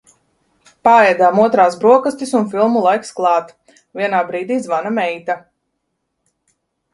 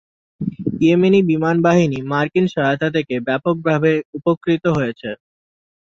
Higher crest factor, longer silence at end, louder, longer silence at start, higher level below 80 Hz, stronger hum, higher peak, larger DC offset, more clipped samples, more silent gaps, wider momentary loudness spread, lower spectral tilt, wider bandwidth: about the same, 16 dB vs 16 dB; first, 1.55 s vs 0.75 s; about the same, -15 LUFS vs -17 LUFS; first, 0.85 s vs 0.4 s; second, -62 dBFS vs -54 dBFS; neither; about the same, 0 dBFS vs -2 dBFS; neither; neither; second, none vs 4.05-4.13 s, 4.37-4.41 s; about the same, 11 LU vs 10 LU; second, -5.5 dB/octave vs -7.5 dB/octave; first, 11.5 kHz vs 7.6 kHz